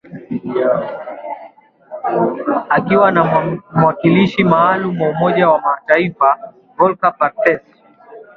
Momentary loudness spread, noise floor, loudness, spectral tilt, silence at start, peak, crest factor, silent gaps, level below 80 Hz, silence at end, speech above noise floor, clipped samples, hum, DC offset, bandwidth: 14 LU; -41 dBFS; -15 LUFS; -8.5 dB/octave; 0.1 s; 0 dBFS; 16 dB; none; -54 dBFS; 0.15 s; 28 dB; under 0.1%; none; under 0.1%; 6.4 kHz